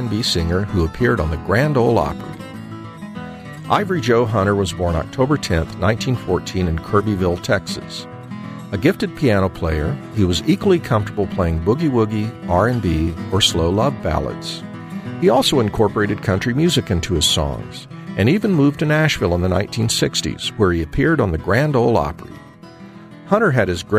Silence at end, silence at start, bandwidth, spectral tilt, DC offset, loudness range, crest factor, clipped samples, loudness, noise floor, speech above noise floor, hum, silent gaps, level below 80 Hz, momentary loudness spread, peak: 0 s; 0 s; 15.5 kHz; -5.5 dB/octave; under 0.1%; 3 LU; 18 dB; under 0.1%; -18 LUFS; -39 dBFS; 22 dB; none; none; -34 dBFS; 15 LU; 0 dBFS